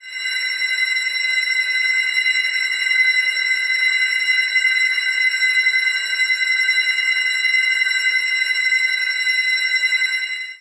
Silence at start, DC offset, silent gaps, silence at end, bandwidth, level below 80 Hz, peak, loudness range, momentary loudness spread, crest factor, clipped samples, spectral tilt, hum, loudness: 0.05 s; under 0.1%; none; 0.05 s; 11.5 kHz; under -90 dBFS; -6 dBFS; 1 LU; 3 LU; 12 dB; under 0.1%; 5.5 dB/octave; none; -16 LUFS